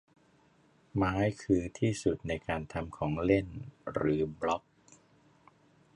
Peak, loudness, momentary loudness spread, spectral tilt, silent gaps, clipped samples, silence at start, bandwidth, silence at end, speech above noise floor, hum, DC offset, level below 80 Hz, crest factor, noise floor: -12 dBFS; -33 LUFS; 9 LU; -7 dB/octave; none; under 0.1%; 0.95 s; 11.5 kHz; 1.35 s; 34 dB; none; under 0.1%; -52 dBFS; 22 dB; -66 dBFS